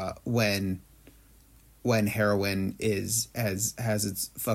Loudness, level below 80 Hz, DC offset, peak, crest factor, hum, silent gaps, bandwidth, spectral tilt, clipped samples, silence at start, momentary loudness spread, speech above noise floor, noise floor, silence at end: -28 LUFS; -58 dBFS; under 0.1%; -12 dBFS; 16 dB; none; none; 16.5 kHz; -4.5 dB/octave; under 0.1%; 0 s; 6 LU; 29 dB; -57 dBFS; 0 s